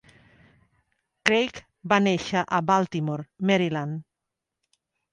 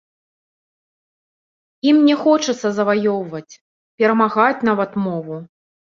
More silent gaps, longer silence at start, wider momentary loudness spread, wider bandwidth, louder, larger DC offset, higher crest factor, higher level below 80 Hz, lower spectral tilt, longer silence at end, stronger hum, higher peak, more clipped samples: second, none vs 3.61-3.98 s; second, 1.25 s vs 1.85 s; second, 9 LU vs 15 LU; first, 11 kHz vs 7.4 kHz; second, -24 LUFS vs -17 LUFS; neither; first, 26 dB vs 18 dB; about the same, -62 dBFS vs -66 dBFS; about the same, -5.5 dB/octave vs -5.5 dB/octave; first, 1.1 s vs 0.5 s; neither; about the same, 0 dBFS vs -2 dBFS; neither